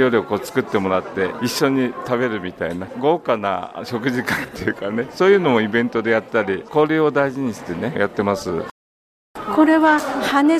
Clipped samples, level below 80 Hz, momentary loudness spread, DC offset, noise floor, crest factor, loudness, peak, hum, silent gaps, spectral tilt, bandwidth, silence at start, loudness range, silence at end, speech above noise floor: under 0.1%; -54 dBFS; 11 LU; under 0.1%; under -90 dBFS; 16 dB; -19 LUFS; -4 dBFS; none; 8.71-9.34 s; -5.5 dB/octave; 15.5 kHz; 0 s; 3 LU; 0 s; over 71 dB